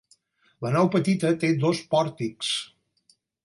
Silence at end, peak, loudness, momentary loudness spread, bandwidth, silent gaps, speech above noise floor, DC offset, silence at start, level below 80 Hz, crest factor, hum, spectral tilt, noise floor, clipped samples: 0.8 s; -8 dBFS; -25 LUFS; 8 LU; 11.5 kHz; none; 42 dB; under 0.1%; 0.6 s; -70 dBFS; 18 dB; none; -5.5 dB/octave; -66 dBFS; under 0.1%